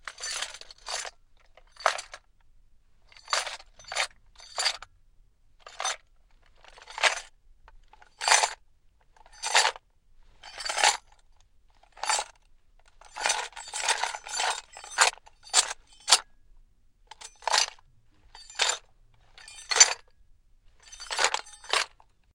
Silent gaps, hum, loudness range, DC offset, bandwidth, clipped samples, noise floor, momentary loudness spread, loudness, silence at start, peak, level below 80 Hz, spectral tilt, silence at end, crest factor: none; none; 7 LU; under 0.1%; 16.5 kHz; under 0.1%; -60 dBFS; 19 LU; -27 LUFS; 0.05 s; 0 dBFS; -60 dBFS; 3 dB/octave; 0.45 s; 30 dB